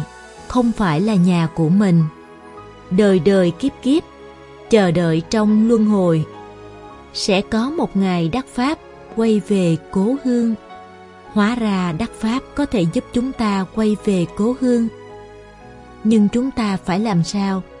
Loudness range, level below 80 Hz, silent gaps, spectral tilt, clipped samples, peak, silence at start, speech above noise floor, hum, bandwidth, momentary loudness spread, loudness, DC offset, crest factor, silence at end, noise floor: 4 LU; -44 dBFS; none; -7 dB/octave; under 0.1%; 0 dBFS; 0 s; 23 dB; none; 11.5 kHz; 15 LU; -18 LUFS; under 0.1%; 18 dB; 0 s; -40 dBFS